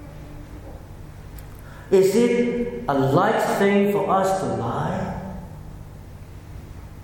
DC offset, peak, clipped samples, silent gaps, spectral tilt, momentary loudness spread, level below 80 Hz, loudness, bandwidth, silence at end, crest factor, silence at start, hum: under 0.1%; -6 dBFS; under 0.1%; none; -6.5 dB/octave; 22 LU; -44 dBFS; -21 LUFS; 17.5 kHz; 0 s; 18 dB; 0 s; none